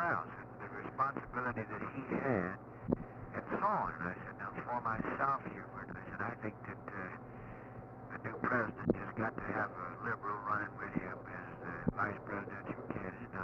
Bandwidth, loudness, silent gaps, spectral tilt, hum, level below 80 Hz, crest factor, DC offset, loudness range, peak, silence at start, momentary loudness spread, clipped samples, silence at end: 6.8 kHz; -40 LUFS; none; -9.5 dB/octave; none; -62 dBFS; 24 dB; under 0.1%; 3 LU; -14 dBFS; 0 s; 12 LU; under 0.1%; 0 s